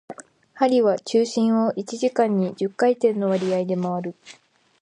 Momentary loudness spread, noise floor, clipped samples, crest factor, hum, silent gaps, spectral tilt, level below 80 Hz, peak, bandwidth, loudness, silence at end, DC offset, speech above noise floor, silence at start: 8 LU; -42 dBFS; under 0.1%; 16 dB; none; none; -6.5 dB/octave; -72 dBFS; -6 dBFS; 10.5 kHz; -22 LUFS; 0.5 s; under 0.1%; 21 dB; 0.1 s